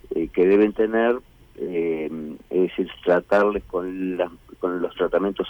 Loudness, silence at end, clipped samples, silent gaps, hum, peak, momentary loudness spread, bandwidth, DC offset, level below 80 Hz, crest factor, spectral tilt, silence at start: -23 LUFS; 0 s; under 0.1%; none; none; -8 dBFS; 11 LU; 19.5 kHz; under 0.1%; -50 dBFS; 14 dB; -7.5 dB/octave; 0.1 s